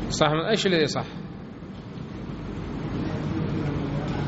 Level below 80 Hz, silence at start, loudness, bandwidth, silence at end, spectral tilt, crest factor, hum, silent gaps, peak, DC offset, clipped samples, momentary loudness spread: -44 dBFS; 0 s; -27 LUFS; 8 kHz; 0 s; -4.5 dB/octave; 22 dB; none; none; -4 dBFS; under 0.1%; under 0.1%; 16 LU